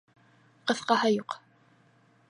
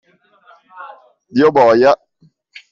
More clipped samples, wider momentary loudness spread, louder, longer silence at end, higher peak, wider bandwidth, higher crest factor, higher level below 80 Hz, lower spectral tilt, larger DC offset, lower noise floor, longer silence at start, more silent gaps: neither; second, 16 LU vs 26 LU; second, -28 LUFS vs -12 LUFS; first, 0.9 s vs 0.75 s; second, -10 dBFS vs -2 dBFS; first, 11.5 kHz vs 7.4 kHz; first, 22 dB vs 14 dB; second, -80 dBFS vs -58 dBFS; second, -4 dB/octave vs -6.5 dB/octave; neither; first, -63 dBFS vs -55 dBFS; second, 0.65 s vs 0.8 s; neither